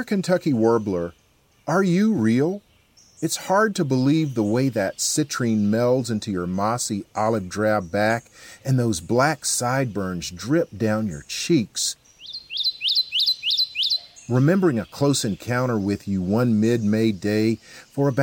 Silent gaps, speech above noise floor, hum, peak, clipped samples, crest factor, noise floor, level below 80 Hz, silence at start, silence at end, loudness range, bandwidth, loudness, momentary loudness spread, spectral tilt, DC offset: none; 34 dB; none; -6 dBFS; under 0.1%; 16 dB; -56 dBFS; -58 dBFS; 0 s; 0 s; 3 LU; 17 kHz; -22 LUFS; 8 LU; -4.5 dB/octave; under 0.1%